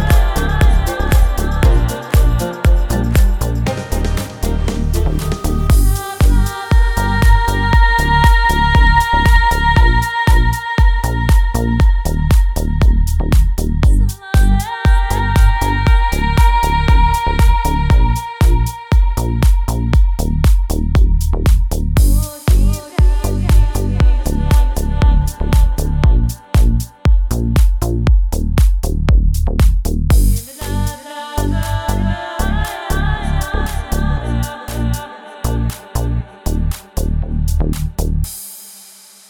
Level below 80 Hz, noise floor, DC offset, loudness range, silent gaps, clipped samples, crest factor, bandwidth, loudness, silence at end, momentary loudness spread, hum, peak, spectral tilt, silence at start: -14 dBFS; -40 dBFS; under 0.1%; 7 LU; none; under 0.1%; 12 dB; 17.5 kHz; -16 LUFS; 0.55 s; 8 LU; none; 0 dBFS; -5.5 dB/octave; 0 s